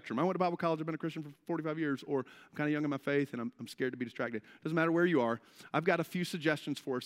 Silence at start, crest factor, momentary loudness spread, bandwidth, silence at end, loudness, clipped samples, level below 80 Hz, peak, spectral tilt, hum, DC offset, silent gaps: 0.05 s; 20 dB; 10 LU; 16 kHz; 0 s; -34 LUFS; under 0.1%; -84 dBFS; -14 dBFS; -6.5 dB/octave; none; under 0.1%; none